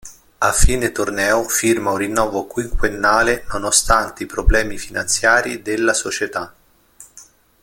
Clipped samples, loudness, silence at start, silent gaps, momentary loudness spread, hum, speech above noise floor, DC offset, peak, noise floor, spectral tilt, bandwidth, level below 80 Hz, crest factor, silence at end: under 0.1%; -18 LUFS; 0.05 s; none; 10 LU; none; 29 dB; under 0.1%; 0 dBFS; -47 dBFS; -3 dB/octave; 17 kHz; -26 dBFS; 18 dB; 0.4 s